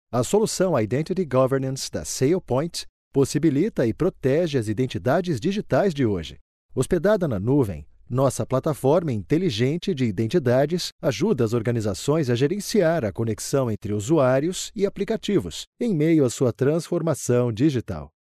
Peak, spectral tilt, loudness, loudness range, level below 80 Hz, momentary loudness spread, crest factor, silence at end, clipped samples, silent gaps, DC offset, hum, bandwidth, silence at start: -8 dBFS; -6 dB/octave; -23 LUFS; 1 LU; -48 dBFS; 7 LU; 14 dB; 0.35 s; under 0.1%; 2.89-3.11 s, 6.41-6.69 s, 10.92-10.99 s, 15.67-15.73 s; under 0.1%; none; 13 kHz; 0.1 s